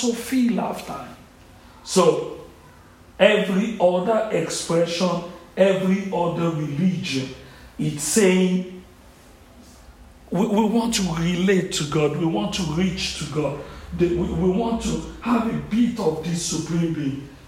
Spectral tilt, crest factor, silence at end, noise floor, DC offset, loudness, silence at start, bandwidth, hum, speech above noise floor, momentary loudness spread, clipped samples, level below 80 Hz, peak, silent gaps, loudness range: -5 dB/octave; 20 dB; 0.1 s; -48 dBFS; under 0.1%; -22 LUFS; 0 s; 16 kHz; none; 27 dB; 11 LU; under 0.1%; -44 dBFS; -2 dBFS; none; 3 LU